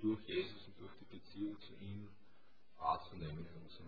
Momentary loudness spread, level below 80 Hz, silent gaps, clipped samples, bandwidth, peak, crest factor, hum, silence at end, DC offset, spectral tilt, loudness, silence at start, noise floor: 16 LU; -68 dBFS; none; under 0.1%; 5.4 kHz; -24 dBFS; 22 dB; none; 0 s; 0.2%; -5 dB/octave; -45 LUFS; 0 s; -73 dBFS